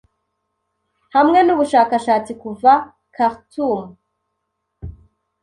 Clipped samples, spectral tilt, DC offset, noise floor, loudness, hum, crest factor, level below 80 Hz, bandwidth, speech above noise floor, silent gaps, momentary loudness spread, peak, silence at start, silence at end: under 0.1%; -5.5 dB/octave; under 0.1%; -75 dBFS; -16 LUFS; none; 16 dB; -50 dBFS; 11.5 kHz; 59 dB; none; 23 LU; -2 dBFS; 1.15 s; 0.5 s